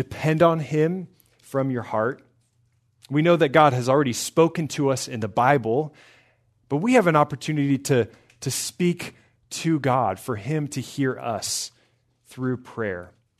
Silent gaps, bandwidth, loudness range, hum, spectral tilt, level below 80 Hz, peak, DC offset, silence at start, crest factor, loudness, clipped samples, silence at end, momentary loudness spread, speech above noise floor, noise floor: none; 13.5 kHz; 6 LU; none; -5.5 dB/octave; -64 dBFS; -2 dBFS; under 0.1%; 0 s; 22 dB; -23 LUFS; under 0.1%; 0.35 s; 13 LU; 44 dB; -66 dBFS